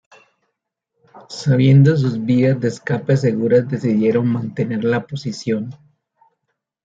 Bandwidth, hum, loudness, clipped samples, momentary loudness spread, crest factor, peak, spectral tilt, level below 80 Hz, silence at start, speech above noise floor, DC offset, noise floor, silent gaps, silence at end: 7.8 kHz; none; -17 LUFS; under 0.1%; 12 LU; 16 dB; -2 dBFS; -8 dB/octave; -60 dBFS; 1.15 s; 60 dB; under 0.1%; -76 dBFS; none; 1.15 s